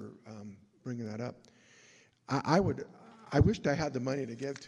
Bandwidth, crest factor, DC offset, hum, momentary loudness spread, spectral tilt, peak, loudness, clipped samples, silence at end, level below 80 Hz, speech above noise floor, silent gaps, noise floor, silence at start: 11 kHz; 22 dB; under 0.1%; none; 20 LU; -6.5 dB/octave; -12 dBFS; -33 LUFS; under 0.1%; 0 s; -50 dBFS; 30 dB; none; -62 dBFS; 0 s